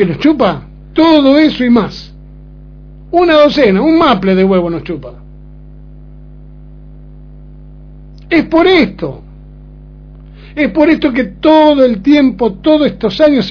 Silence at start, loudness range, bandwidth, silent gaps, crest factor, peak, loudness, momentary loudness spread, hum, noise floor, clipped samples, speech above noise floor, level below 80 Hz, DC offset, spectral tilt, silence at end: 0 s; 7 LU; 5.4 kHz; none; 12 dB; 0 dBFS; -10 LUFS; 15 LU; 50 Hz at -35 dBFS; -33 dBFS; 0.3%; 24 dB; -34 dBFS; under 0.1%; -7.5 dB/octave; 0 s